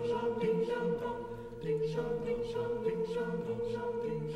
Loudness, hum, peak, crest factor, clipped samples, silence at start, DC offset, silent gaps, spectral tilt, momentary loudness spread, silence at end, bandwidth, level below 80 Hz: -35 LUFS; none; -22 dBFS; 12 dB; under 0.1%; 0 s; under 0.1%; none; -7.5 dB/octave; 5 LU; 0 s; 10.5 kHz; -56 dBFS